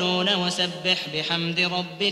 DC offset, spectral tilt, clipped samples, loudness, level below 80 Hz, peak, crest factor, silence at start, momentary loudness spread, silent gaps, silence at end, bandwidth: under 0.1%; -3.5 dB/octave; under 0.1%; -23 LUFS; -66 dBFS; -8 dBFS; 16 dB; 0 s; 3 LU; none; 0 s; 14 kHz